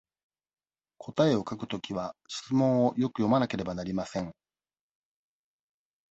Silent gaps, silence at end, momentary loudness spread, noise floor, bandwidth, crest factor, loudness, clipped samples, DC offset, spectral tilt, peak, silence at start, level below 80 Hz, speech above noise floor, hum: none; 1.8 s; 11 LU; under -90 dBFS; 8.2 kHz; 20 dB; -29 LUFS; under 0.1%; under 0.1%; -6.5 dB/octave; -10 dBFS; 1 s; -62 dBFS; over 62 dB; none